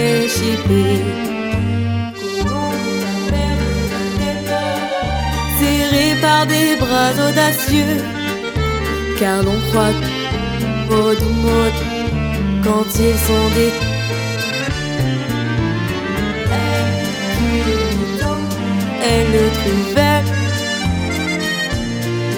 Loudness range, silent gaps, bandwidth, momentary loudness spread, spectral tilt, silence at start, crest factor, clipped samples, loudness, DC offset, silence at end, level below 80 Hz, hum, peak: 4 LU; none; over 20 kHz; 6 LU; -5 dB/octave; 0 s; 16 dB; under 0.1%; -17 LUFS; under 0.1%; 0 s; -28 dBFS; none; 0 dBFS